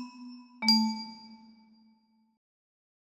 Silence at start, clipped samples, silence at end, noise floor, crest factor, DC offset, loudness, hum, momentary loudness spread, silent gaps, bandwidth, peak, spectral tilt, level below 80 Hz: 0 s; under 0.1%; 1.85 s; -67 dBFS; 24 dB; under 0.1%; -27 LUFS; none; 24 LU; none; 12.5 kHz; -12 dBFS; -2.5 dB/octave; -84 dBFS